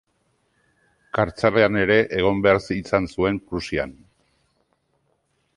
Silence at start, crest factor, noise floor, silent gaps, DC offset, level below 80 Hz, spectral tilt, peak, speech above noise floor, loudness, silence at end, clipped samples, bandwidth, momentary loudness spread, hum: 1.15 s; 20 dB; -69 dBFS; none; under 0.1%; -46 dBFS; -6.5 dB/octave; -4 dBFS; 48 dB; -21 LUFS; 1.65 s; under 0.1%; 11 kHz; 10 LU; none